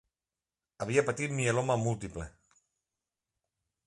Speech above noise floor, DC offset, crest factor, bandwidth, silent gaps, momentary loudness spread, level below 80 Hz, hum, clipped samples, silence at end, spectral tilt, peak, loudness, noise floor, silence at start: over 59 dB; under 0.1%; 22 dB; 11.5 kHz; none; 14 LU; -58 dBFS; none; under 0.1%; 1.6 s; -5.5 dB/octave; -12 dBFS; -31 LUFS; under -90 dBFS; 0.8 s